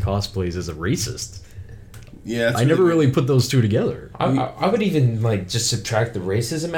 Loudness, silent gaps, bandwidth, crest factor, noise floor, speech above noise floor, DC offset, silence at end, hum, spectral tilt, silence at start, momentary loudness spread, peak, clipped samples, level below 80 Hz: -20 LUFS; none; 17.5 kHz; 14 dB; -40 dBFS; 20 dB; under 0.1%; 0 s; none; -5.5 dB/octave; 0 s; 14 LU; -6 dBFS; under 0.1%; -42 dBFS